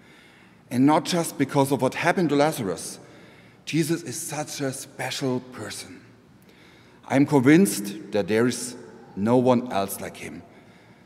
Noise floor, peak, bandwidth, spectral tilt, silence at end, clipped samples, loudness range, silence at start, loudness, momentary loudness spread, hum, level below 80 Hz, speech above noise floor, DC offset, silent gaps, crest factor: -52 dBFS; -4 dBFS; 16 kHz; -5 dB/octave; 0.65 s; under 0.1%; 7 LU; 0.7 s; -23 LUFS; 17 LU; none; -68 dBFS; 29 dB; under 0.1%; none; 20 dB